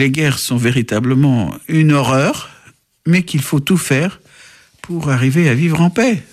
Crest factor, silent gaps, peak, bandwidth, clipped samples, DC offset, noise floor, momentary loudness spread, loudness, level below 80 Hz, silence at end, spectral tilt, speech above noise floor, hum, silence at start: 12 dB; none; -2 dBFS; 15 kHz; under 0.1%; under 0.1%; -48 dBFS; 8 LU; -15 LUFS; -48 dBFS; 0.1 s; -6 dB/octave; 34 dB; none; 0 s